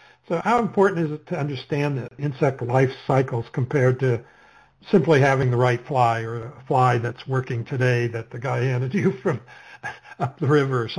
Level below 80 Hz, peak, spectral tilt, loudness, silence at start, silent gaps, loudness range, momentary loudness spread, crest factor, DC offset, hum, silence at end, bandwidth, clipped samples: -58 dBFS; -6 dBFS; -7.5 dB/octave; -22 LUFS; 0.3 s; none; 3 LU; 11 LU; 16 dB; under 0.1%; none; 0 s; 10.5 kHz; under 0.1%